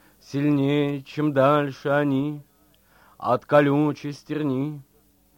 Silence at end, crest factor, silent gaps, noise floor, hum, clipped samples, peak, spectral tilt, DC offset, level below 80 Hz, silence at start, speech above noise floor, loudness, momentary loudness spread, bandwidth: 0.55 s; 20 dB; none; -60 dBFS; none; under 0.1%; -4 dBFS; -8 dB/octave; under 0.1%; -64 dBFS; 0.3 s; 38 dB; -23 LUFS; 13 LU; 16 kHz